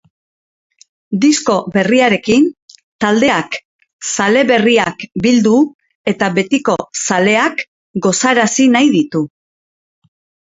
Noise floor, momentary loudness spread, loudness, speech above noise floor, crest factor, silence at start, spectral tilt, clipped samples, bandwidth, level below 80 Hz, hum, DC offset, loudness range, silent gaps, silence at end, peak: under -90 dBFS; 10 LU; -13 LUFS; over 78 dB; 14 dB; 1.1 s; -4 dB/octave; under 0.1%; 8 kHz; -54 dBFS; none; under 0.1%; 1 LU; 2.62-2.68 s, 2.83-2.99 s, 3.65-3.79 s, 3.93-3.99 s, 5.74-5.79 s, 5.95-6.05 s, 7.68-7.94 s; 1.25 s; 0 dBFS